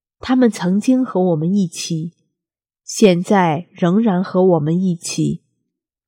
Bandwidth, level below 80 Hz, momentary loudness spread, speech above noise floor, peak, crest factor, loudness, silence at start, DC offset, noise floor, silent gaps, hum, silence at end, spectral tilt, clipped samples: 16 kHz; -58 dBFS; 9 LU; 71 dB; 0 dBFS; 16 dB; -17 LUFS; 0.25 s; under 0.1%; -87 dBFS; none; none; 0.7 s; -6 dB/octave; under 0.1%